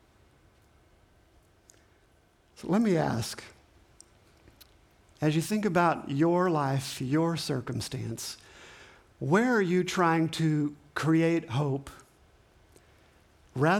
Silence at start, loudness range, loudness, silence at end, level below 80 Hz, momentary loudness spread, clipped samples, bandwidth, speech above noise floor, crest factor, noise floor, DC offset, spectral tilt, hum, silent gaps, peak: 2.6 s; 6 LU; -28 LUFS; 0 s; -62 dBFS; 14 LU; under 0.1%; 18 kHz; 37 dB; 18 dB; -64 dBFS; under 0.1%; -6 dB/octave; none; none; -12 dBFS